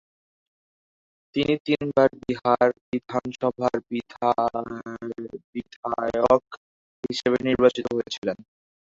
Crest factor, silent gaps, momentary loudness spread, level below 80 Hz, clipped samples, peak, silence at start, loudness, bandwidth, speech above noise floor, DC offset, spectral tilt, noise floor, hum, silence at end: 22 dB; 1.60-1.65 s, 2.81-2.92 s, 5.44-5.53 s, 5.76-5.83 s, 6.57-7.03 s, 8.18-8.22 s; 14 LU; -58 dBFS; under 0.1%; -4 dBFS; 1.35 s; -25 LUFS; 7.8 kHz; over 66 dB; under 0.1%; -6 dB/octave; under -90 dBFS; none; 0.5 s